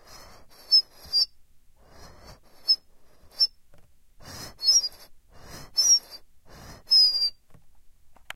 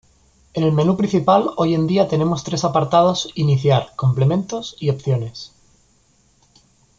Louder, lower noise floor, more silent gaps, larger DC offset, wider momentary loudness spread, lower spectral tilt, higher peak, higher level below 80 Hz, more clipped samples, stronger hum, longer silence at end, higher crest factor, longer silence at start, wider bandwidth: second, -21 LUFS vs -18 LUFS; second, -53 dBFS vs -58 dBFS; neither; neither; first, 15 LU vs 8 LU; second, 1.5 dB/octave vs -7 dB/octave; second, -10 dBFS vs -2 dBFS; about the same, -56 dBFS vs -52 dBFS; neither; neither; second, 0.45 s vs 1.5 s; about the same, 18 dB vs 18 dB; first, 0.7 s vs 0.55 s; first, 16 kHz vs 7.6 kHz